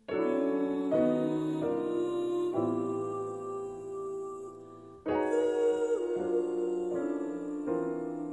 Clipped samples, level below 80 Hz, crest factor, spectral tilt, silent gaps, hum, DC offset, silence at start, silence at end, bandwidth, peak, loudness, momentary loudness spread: under 0.1%; -70 dBFS; 16 dB; -7 dB/octave; none; none; under 0.1%; 0.1 s; 0 s; 11.5 kHz; -16 dBFS; -32 LUFS; 11 LU